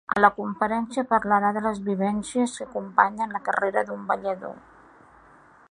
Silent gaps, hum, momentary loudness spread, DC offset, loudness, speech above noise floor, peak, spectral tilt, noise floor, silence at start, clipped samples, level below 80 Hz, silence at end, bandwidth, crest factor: none; none; 8 LU; under 0.1%; -25 LUFS; 29 dB; -2 dBFS; -5.5 dB/octave; -53 dBFS; 0.1 s; under 0.1%; -60 dBFS; 1.15 s; 11 kHz; 24 dB